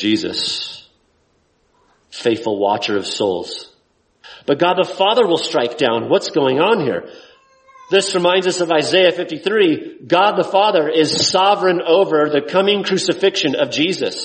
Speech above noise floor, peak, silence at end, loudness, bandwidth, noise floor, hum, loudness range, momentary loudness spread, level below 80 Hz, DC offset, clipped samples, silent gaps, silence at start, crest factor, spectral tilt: 45 dB; 0 dBFS; 0 s; -16 LUFS; 8.8 kHz; -61 dBFS; none; 7 LU; 8 LU; -62 dBFS; under 0.1%; under 0.1%; none; 0 s; 16 dB; -3.5 dB/octave